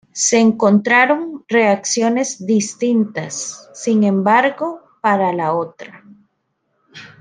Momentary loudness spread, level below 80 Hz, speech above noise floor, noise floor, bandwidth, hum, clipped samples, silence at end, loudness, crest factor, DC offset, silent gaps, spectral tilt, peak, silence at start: 12 LU; -66 dBFS; 53 dB; -69 dBFS; 10 kHz; none; under 0.1%; 0.15 s; -16 LUFS; 16 dB; under 0.1%; none; -4 dB/octave; -2 dBFS; 0.15 s